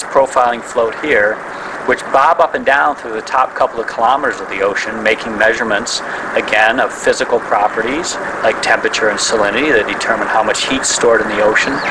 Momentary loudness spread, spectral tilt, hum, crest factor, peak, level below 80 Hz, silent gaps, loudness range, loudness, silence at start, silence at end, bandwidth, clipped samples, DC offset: 6 LU; -2 dB/octave; none; 14 dB; 0 dBFS; -46 dBFS; none; 2 LU; -14 LUFS; 0 s; 0 s; 11 kHz; 0.1%; under 0.1%